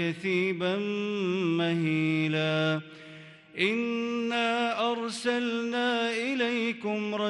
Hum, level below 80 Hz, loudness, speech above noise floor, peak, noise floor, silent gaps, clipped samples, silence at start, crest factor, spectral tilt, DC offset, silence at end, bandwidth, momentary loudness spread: none; -78 dBFS; -28 LUFS; 20 dB; -12 dBFS; -49 dBFS; none; under 0.1%; 0 s; 16 dB; -5.5 dB/octave; under 0.1%; 0 s; 11.5 kHz; 4 LU